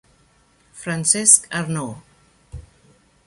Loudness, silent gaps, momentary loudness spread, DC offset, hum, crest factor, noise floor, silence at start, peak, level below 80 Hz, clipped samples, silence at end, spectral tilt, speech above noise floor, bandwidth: -16 LUFS; none; 20 LU; under 0.1%; none; 24 dB; -58 dBFS; 0.75 s; 0 dBFS; -50 dBFS; under 0.1%; 0.65 s; -2.5 dB/octave; 39 dB; 16 kHz